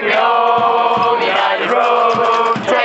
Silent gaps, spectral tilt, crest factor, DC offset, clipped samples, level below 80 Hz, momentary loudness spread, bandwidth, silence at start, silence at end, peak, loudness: none; -4 dB/octave; 12 dB; under 0.1%; under 0.1%; -64 dBFS; 2 LU; 8.2 kHz; 0 s; 0 s; -2 dBFS; -13 LUFS